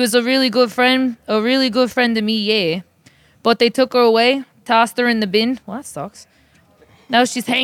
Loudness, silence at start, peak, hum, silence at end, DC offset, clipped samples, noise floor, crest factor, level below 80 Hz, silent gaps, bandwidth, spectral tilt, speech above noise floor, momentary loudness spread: -16 LUFS; 0 s; 0 dBFS; none; 0 s; under 0.1%; under 0.1%; -53 dBFS; 16 dB; -62 dBFS; none; 16.5 kHz; -3.5 dB/octave; 37 dB; 12 LU